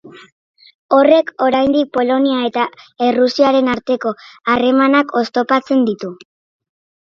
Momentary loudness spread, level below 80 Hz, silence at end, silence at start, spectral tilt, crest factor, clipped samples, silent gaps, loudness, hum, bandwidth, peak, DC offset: 8 LU; -56 dBFS; 1.05 s; 0.05 s; -5.5 dB/octave; 16 dB; under 0.1%; 0.32-0.54 s, 0.74-0.89 s; -15 LUFS; none; 7.2 kHz; 0 dBFS; under 0.1%